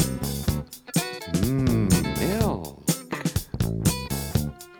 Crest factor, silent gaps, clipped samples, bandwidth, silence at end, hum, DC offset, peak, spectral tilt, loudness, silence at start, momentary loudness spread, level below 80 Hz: 18 dB; none; under 0.1%; over 20 kHz; 0 s; none; under 0.1%; -6 dBFS; -5 dB/octave; -26 LUFS; 0 s; 6 LU; -38 dBFS